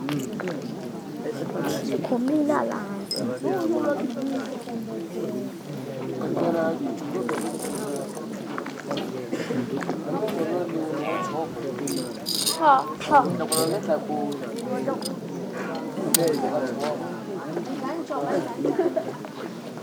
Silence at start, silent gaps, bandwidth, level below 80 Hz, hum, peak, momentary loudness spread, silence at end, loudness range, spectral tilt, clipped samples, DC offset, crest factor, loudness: 0 s; none; over 20 kHz; -68 dBFS; none; -2 dBFS; 12 LU; 0 s; 6 LU; -4.5 dB/octave; under 0.1%; under 0.1%; 26 dB; -27 LUFS